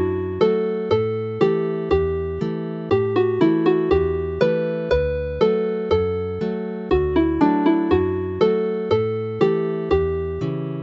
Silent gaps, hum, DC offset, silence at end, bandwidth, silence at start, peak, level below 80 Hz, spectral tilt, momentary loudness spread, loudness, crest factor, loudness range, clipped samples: none; none; under 0.1%; 0 s; 6.8 kHz; 0 s; -4 dBFS; -38 dBFS; -9 dB/octave; 7 LU; -21 LUFS; 16 dB; 1 LU; under 0.1%